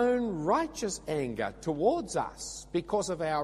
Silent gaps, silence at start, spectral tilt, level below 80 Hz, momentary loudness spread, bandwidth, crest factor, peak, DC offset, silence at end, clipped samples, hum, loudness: none; 0 s; -4.5 dB/octave; -54 dBFS; 7 LU; 14 kHz; 16 dB; -14 dBFS; under 0.1%; 0 s; under 0.1%; none; -31 LUFS